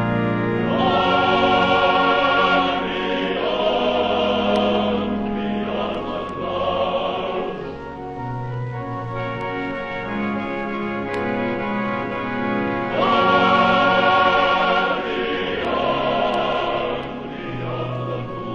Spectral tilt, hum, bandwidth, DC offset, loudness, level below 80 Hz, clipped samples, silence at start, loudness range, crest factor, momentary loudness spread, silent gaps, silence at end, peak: -6.5 dB/octave; none; 10 kHz; under 0.1%; -20 LUFS; -46 dBFS; under 0.1%; 0 s; 8 LU; 16 dB; 12 LU; none; 0 s; -4 dBFS